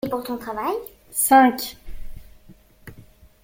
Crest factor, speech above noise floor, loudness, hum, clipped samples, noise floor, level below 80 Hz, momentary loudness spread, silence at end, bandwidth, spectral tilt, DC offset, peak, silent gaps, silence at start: 20 dB; 29 dB; -20 LUFS; none; under 0.1%; -50 dBFS; -44 dBFS; 16 LU; 0.45 s; 17 kHz; -3 dB/octave; under 0.1%; -2 dBFS; none; 0.05 s